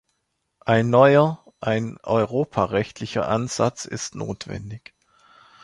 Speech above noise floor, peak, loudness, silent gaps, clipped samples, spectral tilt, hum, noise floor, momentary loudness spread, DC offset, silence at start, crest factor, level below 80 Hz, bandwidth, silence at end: 54 dB; -2 dBFS; -22 LUFS; none; under 0.1%; -6 dB/octave; none; -75 dBFS; 17 LU; under 0.1%; 0.65 s; 20 dB; -54 dBFS; 11.5 kHz; 0.85 s